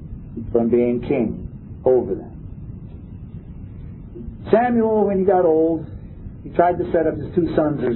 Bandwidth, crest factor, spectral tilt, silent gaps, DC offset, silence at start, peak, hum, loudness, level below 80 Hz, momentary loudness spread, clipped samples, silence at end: 4.2 kHz; 20 dB; -12.5 dB/octave; none; under 0.1%; 0 s; 0 dBFS; none; -19 LUFS; -40 dBFS; 20 LU; under 0.1%; 0 s